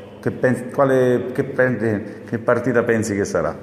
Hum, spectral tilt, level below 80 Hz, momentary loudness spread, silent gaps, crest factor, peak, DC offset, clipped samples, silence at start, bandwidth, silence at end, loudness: none; -6.5 dB/octave; -56 dBFS; 7 LU; none; 16 dB; -4 dBFS; under 0.1%; under 0.1%; 0 s; 14 kHz; 0 s; -20 LUFS